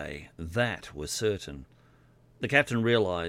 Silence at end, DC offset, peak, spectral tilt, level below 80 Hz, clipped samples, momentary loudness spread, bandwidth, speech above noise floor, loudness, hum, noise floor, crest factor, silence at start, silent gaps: 0 s; under 0.1%; -6 dBFS; -4.5 dB/octave; -54 dBFS; under 0.1%; 16 LU; 16.5 kHz; 31 dB; -28 LUFS; none; -60 dBFS; 24 dB; 0 s; none